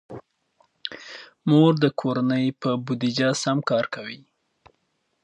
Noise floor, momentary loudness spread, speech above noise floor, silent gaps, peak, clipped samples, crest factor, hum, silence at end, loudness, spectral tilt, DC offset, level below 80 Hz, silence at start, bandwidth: -72 dBFS; 21 LU; 50 dB; none; -6 dBFS; under 0.1%; 20 dB; none; 1.1 s; -23 LUFS; -6 dB/octave; under 0.1%; -70 dBFS; 0.1 s; 10.5 kHz